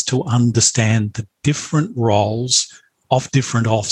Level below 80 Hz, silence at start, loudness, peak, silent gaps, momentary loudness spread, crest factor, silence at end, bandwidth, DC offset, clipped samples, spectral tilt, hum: -52 dBFS; 0 s; -17 LUFS; -2 dBFS; none; 7 LU; 16 dB; 0 s; 11.5 kHz; under 0.1%; under 0.1%; -4.5 dB/octave; none